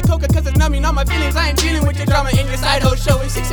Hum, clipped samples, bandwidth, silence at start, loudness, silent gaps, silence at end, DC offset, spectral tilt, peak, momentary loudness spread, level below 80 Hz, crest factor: none; under 0.1%; 19.5 kHz; 0 s; -16 LUFS; none; 0 s; under 0.1%; -5 dB/octave; 0 dBFS; 2 LU; -18 dBFS; 14 dB